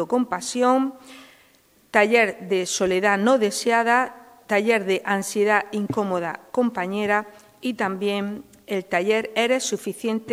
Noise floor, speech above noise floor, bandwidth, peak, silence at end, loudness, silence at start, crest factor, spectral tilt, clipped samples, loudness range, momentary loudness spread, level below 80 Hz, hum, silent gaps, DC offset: -58 dBFS; 36 dB; 16 kHz; -2 dBFS; 0 s; -22 LUFS; 0 s; 20 dB; -4 dB/octave; under 0.1%; 4 LU; 9 LU; -66 dBFS; none; none; under 0.1%